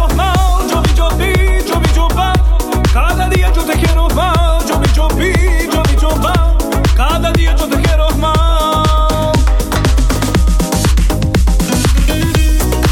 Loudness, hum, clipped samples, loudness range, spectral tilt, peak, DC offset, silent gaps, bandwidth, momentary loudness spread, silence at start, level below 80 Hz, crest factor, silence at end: -13 LUFS; none; under 0.1%; 0 LU; -5 dB/octave; 0 dBFS; under 0.1%; none; 17 kHz; 1 LU; 0 s; -12 dBFS; 10 dB; 0 s